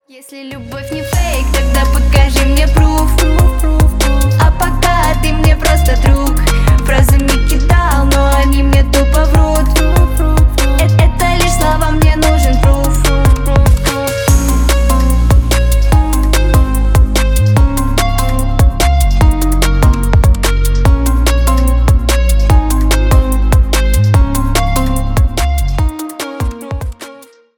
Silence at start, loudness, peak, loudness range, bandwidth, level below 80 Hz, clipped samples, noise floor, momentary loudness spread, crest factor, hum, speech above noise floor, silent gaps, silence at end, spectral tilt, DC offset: 0.3 s; -12 LUFS; 0 dBFS; 1 LU; 19.5 kHz; -10 dBFS; under 0.1%; -37 dBFS; 5 LU; 10 dB; none; 26 dB; none; 0.4 s; -5.5 dB/octave; under 0.1%